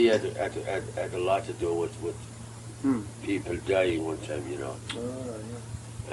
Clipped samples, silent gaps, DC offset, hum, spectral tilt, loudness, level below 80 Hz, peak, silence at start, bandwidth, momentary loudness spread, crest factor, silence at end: under 0.1%; none; under 0.1%; none; -5.5 dB/octave; -31 LUFS; -52 dBFS; -12 dBFS; 0 s; 12 kHz; 14 LU; 18 dB; 0 s